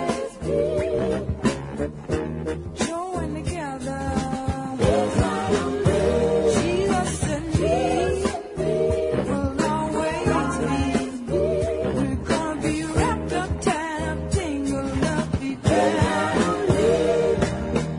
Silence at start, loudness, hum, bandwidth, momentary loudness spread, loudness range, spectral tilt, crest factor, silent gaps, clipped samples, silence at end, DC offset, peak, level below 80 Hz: 0 s; -23 LUFS; none; 11 kHz; 7 LU; 4 LU; -6 dB/octave; 16 dB; none; under 0.1%; 0 s; under 0.1%; -6 dBFS; -38 dBFS